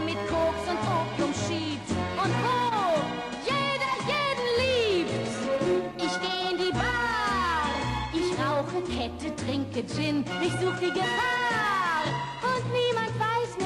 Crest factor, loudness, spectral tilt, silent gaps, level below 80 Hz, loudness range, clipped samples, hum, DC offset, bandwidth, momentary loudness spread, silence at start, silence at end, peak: 12 dB; -27 LUFS; -5 dB/octave; none; -48 dBFS; 2 LU; under 0.1%; none; under 0.1%; 13 kHz; 5 LU; 0 s; 0 s; -14 dBFS